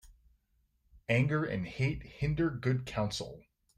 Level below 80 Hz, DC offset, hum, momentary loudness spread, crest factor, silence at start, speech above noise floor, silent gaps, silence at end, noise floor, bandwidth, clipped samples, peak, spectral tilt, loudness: -52 dBFS; under 0.1%; none; 9 LU; 18 dB; 0.05 s; 42 dB; none; 0.4 s; -74 dBFS; 10 kHz; under 0.1%; -16 dBFS; -6.5 dB/octave; -33 LUFS